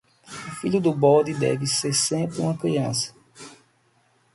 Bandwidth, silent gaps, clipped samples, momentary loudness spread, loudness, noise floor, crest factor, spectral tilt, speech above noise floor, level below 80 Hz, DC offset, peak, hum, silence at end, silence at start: 11.5 kHz; none; under 0.1%; 19 LU; -22 LUFS; -63 dBFS; 20 dB; -4.5 dB/octave; 41 dB; -62 dBFS; under 0.1%; -6 dBFS; none; 0.8 s; 0.3 s